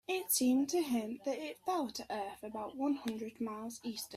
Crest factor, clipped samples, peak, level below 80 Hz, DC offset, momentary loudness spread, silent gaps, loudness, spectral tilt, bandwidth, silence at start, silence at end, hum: 18 dB; under 0.1%; -20 dBFS; -74 dBFS; under 0.1%; 12 LU; none; -37 LUFS; -3 dB/octave; 16 kHz; 0.1 s; 0 s; none